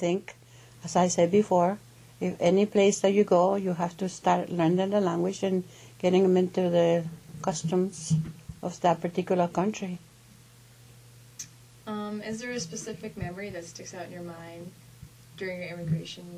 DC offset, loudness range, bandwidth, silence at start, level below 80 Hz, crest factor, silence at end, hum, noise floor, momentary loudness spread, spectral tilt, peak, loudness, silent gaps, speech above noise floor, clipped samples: under 0.1%; 13 LU; 15 kHz; 0 s; -60 dBFS; 18 dB; 0 s; none; -54 dBFS; 18 LU; -6 dB/octave; -10 dBFS; -27 LUFS; none; 27 dB; under 0.1%